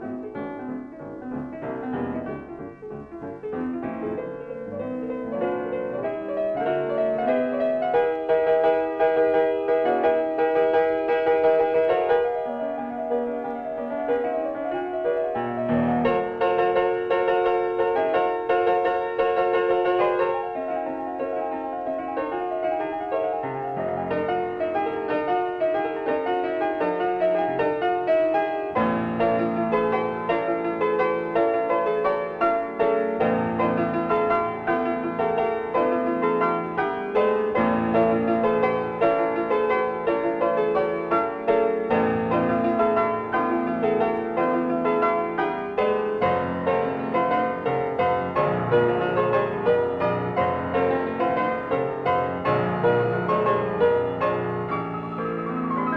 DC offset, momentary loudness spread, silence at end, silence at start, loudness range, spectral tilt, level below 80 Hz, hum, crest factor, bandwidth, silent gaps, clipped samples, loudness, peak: under 0.1%; 8 LU; 0 s; 0 s; 6 LU; -8.5 dB/octave; -56 dBFS; none; 14 dB; 5.6 kHz; none; under 0.1%; -24 LUFS; -8 dBFS